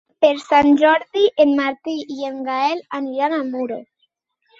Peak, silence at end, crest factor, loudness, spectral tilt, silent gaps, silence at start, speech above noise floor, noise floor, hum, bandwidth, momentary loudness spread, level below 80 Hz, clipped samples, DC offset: -2 dBFS; 0.75 s; 16 dB; -18 LUFS; -4.5 dB/octave; none; 0.2 s; 51 dB; -68 dBFS; none; 7.8 kHz; 13 LU; -60 dBFS; under 0.1%; under 0.1%